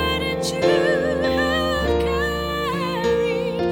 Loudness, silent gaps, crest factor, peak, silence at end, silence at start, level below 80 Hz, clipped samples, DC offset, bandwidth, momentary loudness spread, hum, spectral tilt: -21 LUFS; none; 16 dB; -6 dBFS; 0 s; 0 s; -36 dBFS; under 0.1%; under 0.1%; 17 kHz; 5 LU; none; -5 dB/octave